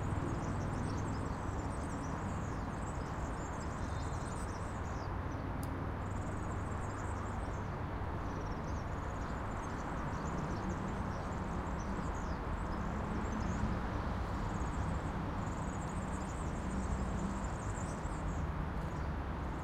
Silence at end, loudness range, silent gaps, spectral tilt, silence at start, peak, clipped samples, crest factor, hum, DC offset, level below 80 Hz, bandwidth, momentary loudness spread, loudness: 0 s; 2 LU; none; -6.5 dB/octave; 0 s; -24 dBFS; under 0.1%; 16 dB; none; under 0.1%; -44 dBFS; 13.5 kHz; 3 LU; -40 LUFS